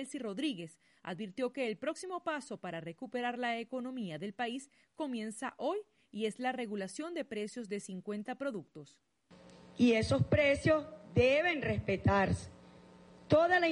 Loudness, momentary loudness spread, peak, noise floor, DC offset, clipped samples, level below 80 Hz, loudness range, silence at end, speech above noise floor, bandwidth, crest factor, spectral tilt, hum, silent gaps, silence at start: -34 LUFS; 15 LU; -16 dBFS; -59 dBFS; under 0.1%; under 0.1%; -58 dBFS; 9 LU; 0 s; 25 dB; 11.5 kHz; 18 dB; -6 dB/octave; none; none; 0 s